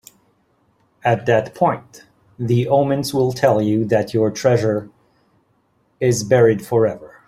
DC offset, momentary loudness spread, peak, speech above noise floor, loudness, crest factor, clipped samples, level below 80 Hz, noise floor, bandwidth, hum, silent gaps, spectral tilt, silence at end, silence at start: under 0.1%; 7 LU; -2 dBFS; 45 dB; -18 LUFS; 16 dB; under 0.1%; -54 dBFS; -62 dBFS; 15.5 kHz; none; none; -6.5 dB/octave; 0.2 s; 1.05 s